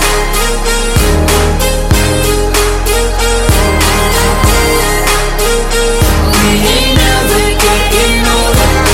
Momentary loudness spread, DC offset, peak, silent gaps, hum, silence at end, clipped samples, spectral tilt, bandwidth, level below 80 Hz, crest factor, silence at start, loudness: 3 LU; under 0.1%; 0 dBFS; none; none; 0 s; under 0.1%; -3.5 dB/octave; 17 kHz; -14 dBFS; 10 dB; 0 s; -10 LUFS